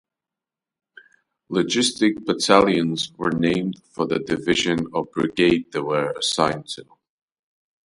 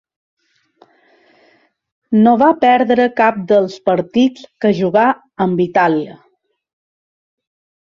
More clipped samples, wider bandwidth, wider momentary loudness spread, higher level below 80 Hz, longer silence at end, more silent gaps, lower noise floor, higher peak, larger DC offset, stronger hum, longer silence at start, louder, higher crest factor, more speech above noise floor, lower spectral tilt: neither; first, 11.5 kHz vs 7.2 kHz; first, 10 LU vs 7 LU; about the same, -56 dBFS vs -60 dBFS; second, 1 s vs 1.8 s; neither; first, -88 dBFS vs -55 dBFS; about the same, 0 dBFS vs -2 dBFS; neither; neither; second, 1.5 s vs 2.1 s; second, -21 LUFS vs -14 LUFS; first, 22 dB vs 14 dB; first, 67 dB vs 42 dB; second, -4 dB/octave vs -7.5 dB/octave